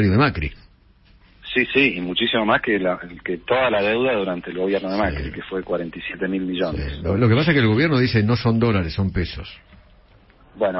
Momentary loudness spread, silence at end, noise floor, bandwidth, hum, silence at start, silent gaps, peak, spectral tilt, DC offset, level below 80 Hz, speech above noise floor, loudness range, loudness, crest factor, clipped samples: 12 LU; 0 s; -53 dBFS; 5.8 kHz; none; 0 s; none; -2 dBFS; -10.5 dB/octave; under 0.1%; -38 dBFS; 33 dB; 3 LU; -21 LUFS; 18 dB; under 0.1%